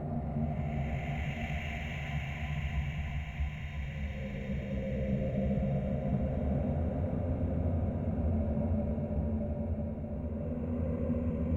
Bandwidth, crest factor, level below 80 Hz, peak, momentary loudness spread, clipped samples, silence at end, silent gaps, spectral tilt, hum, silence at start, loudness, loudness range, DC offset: 7.4 kHz; 14 dB; -40 dBFS; -20 dBFS; 6 LU; under 0.1%; 0 s; none; -9 dB/octave; none; 0 s; -35 LUFS; 4 LU; under 0.1%